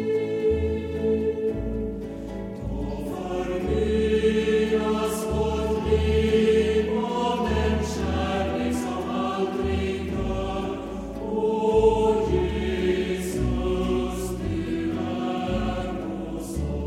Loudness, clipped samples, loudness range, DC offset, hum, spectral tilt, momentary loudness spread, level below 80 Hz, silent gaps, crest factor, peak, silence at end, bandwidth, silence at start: -25 LUFS; under 0.1%; 5 LU; under 0.1%; none; -6.5 dB/octave; 9 LU; -34 dBFS; none; 16 dB; -8 dBFS; 0 s; 15.5 kHz; 0 s